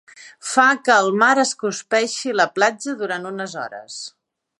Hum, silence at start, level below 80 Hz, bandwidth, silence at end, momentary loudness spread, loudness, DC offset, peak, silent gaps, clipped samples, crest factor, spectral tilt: none; 0.15 s; -78 dBFS; 11.5 kHz; 0.5 s; 17 LU; -18 LUFS; under 0.1%; -2 dBFS; none; under 0.1%; 20 dB; -2.5 dB/octave